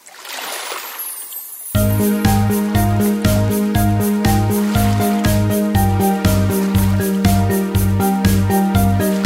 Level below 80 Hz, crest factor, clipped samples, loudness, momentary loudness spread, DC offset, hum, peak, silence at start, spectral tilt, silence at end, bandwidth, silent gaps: -28 dBFS; 14 dB; under 0.1%; -16 LUFS; 9 LU; under 0.1%; none; 0 dBFS; 0.05 s; -6 dB/octave; 0 s; 16.5 kHz; none